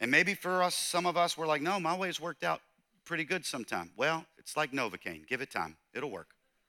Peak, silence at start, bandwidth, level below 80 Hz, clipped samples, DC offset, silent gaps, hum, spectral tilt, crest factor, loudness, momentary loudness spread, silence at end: -12 dBFS; 0 s; 18.5 kHz; -78 dBFS; under 0.1%; under 0.1%; none; none; -3 dB/octave; 22 dB; -33 LUFS; 11 LU; 0.45 s